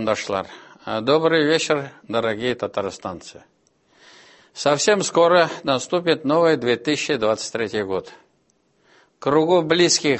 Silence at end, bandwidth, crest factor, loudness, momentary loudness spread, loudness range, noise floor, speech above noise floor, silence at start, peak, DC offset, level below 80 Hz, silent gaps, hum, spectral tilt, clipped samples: 0 s; 8.6 kHz; 18 dB; -20 LUFS; 12 LU; 5 LU; -64 dBFS; 44 dB; 0 s; -2 dBFS; under 0.1%; -60 dBFS; none; none; -3.5 dB/octave; under 0.1%